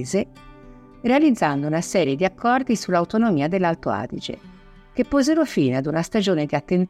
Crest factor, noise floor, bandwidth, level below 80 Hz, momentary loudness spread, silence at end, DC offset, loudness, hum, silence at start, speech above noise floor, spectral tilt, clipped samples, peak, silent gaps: 14 dB; -45 dBFS; 14.5 kHz; -50 dBFS; 10 LU; 0 s; under 0.1%; -21 LUFS; none; 0 s; 24 dB; -6 dB/octave; under 0.1%; -6 dBFS; none